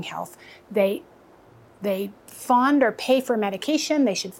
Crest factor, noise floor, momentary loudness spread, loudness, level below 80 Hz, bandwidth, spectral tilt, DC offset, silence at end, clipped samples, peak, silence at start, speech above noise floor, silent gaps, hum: 16 dB; -52 dBFS; 15 LU; -23 LUFS; -70 dBFS; 17 kHz; -4 dB/octave; under 0.1%; 0 s; under 0.1%; -8 dBFS; 0 s; 28 dB; none; none